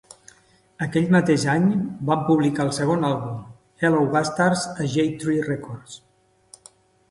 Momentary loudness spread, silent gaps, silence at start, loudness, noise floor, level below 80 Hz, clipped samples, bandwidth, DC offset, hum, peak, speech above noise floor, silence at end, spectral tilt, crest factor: 13 LU; none; 0.8 s; -22 LUFS; -57 dBFS; -58 dBFS; under 0.1%; 11.5 kHz; under 0.1%; none; -6 dBFS; 36 dB; 1.15 s; -6 dB/octave; 18 dB